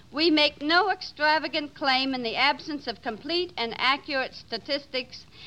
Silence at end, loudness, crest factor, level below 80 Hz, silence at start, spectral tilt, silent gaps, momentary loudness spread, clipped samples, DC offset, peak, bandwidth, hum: 0 s; -25 LUFS; 20 dB; -62 dBFS; 0.1 s; -3.5 dB/octave; none; 11 LU; under 0.1%; 0.2%; -8 dBFS; 9.8 kHz; none